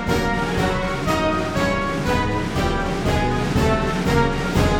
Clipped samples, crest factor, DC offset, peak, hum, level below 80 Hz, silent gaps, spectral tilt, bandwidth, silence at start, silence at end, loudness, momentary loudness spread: under 0.1%; 14 dB; under 0.1%; -6 dBFS; none; -28 dBFS; none; -6 dB/octave; 18.5 kHz; 0 s; 0 s; -21 LUFS; 3 LU